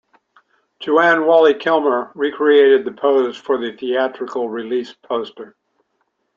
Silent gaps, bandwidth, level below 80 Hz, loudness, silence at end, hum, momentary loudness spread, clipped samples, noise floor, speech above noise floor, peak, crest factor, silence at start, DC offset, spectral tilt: none; 7.2 kHz; -68 dBFS; -16 LUFS; 0.9 s; none; 12 LU; under 0.1%; -69 dBFS; 53 dB; -2 dBFS; 16 dB; 0.8 s; under 0.1%; -5.5 dB/octave